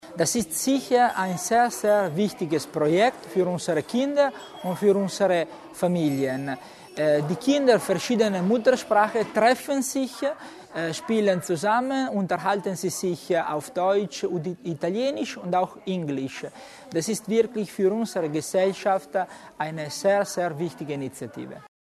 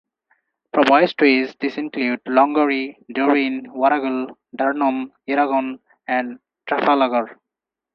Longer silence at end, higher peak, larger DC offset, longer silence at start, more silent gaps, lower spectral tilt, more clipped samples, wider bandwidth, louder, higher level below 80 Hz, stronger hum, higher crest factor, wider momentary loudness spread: second, 0.2 s vs 0.6 s; second, -6 dBFS vs 0 dBFS; neither; second, 0.05 s vs 0.75 s; neither; about the same, -5 dB/octave vs -6 dB/octave; neither; first, 13.5 kHz vs 6.8 kHz; second, -25 LUFS vs -19 LUFS; about the same, -66 dBFS vs -70 dBFS; neither; about the same, 18 dB vs 20 dB; about the same, 11 LU vs 12 LU